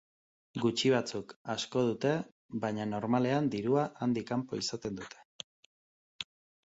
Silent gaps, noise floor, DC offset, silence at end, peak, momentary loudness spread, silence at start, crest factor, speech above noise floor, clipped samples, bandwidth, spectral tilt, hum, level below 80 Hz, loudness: 1.36-1.45 s, 2.32-2.49 s, 5.25-6.19 s; under -90 dBFS; under 0.1%; 0.4 s; -14 dBFS; 15 LU; 0.55 s; 18 dB; over 58 dB; under 0.1%; 8 kHz; -5.5 dB/octave; none; -70 dBFS; -33 LUFS